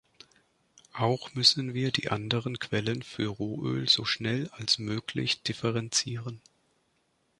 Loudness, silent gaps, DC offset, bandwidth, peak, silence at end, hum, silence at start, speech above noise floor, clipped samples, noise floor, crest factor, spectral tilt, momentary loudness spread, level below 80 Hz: -28 LUFS; none; under 0.1%; 11.5 kHz; -8 dBFS; 1 s; none; 0.95 s; 43 dB; under 0.1%; -73 dBFS; 22 dB; -3.5 dB/octave; 11 LU; -62 dBFS